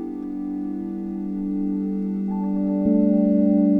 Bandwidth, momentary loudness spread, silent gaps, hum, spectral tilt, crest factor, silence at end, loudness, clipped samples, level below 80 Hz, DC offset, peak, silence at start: 2.8 kHz; 11 LU; none; 50 Hz at -60 dBFS; -12.5 dB/octave; 14 dB; 0 s; -23 LUFS; under 0.1%; -52 dBFS; under 0.1%; -8 dBFS; 0 s